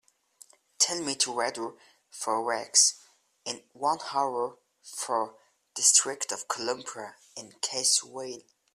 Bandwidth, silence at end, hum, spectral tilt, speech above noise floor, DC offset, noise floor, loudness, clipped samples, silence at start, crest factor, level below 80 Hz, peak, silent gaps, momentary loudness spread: 15 kHz; 0.35 s; none; 0.5 dB/octave; 29 dB; under 0.1%; -58 dBFS; -27 LUFS; under 0.1%; 0.8 s; 24 dB; -80 dBFS; -6 dBFS; none; 21 LU